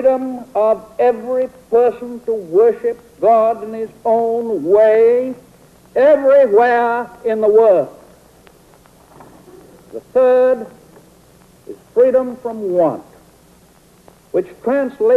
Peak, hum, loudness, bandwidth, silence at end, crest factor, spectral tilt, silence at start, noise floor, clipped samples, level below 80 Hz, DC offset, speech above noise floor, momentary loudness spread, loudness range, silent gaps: -2 dBFS; none; -15 LUFS; 13 kHz; 0 s; 14 dB; -7 dB/octave; 0 s; -48 dBFS; under 0.1%; -56 dBFS; under 0.1%; 34 dB; 13 LU; 6 LU; none